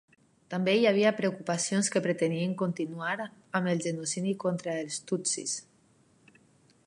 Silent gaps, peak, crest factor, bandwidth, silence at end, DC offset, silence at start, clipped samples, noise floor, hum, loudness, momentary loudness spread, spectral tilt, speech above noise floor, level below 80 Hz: none; -10 dBFS; 20 dB; 11.5 kHz; 1.25 s; under 0.1%; 0.5 s; under 0.1%; -64 dBFS; none; -30 LUFS; 9 LU; -4.5 dB/octave; 35 dB; -80 dBFS